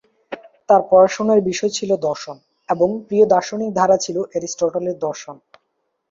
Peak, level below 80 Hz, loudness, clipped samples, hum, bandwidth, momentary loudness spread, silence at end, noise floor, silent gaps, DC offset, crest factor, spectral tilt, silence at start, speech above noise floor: -2 dBFS; -60 dBFS; -18 LUFS; under 0.1%; none; 7.6 kHz; 21 LU; 0.75 s; -72 dBFS; none; under 0.1%; 18 dB; -4.5 dB/octave; 0.3 s; 55 dB